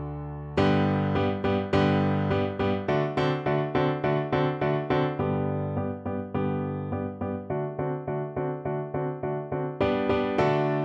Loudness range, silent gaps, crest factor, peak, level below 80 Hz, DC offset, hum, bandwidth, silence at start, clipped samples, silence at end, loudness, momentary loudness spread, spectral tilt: 5 LU; none; 16 dB; -10 dBFS; -50 dBFS; under 0.1%; none; 7.4 kHz; 0 s; under 0.1%; 0 s; -27 LUFS; 7 LU; -8.5 dB/octave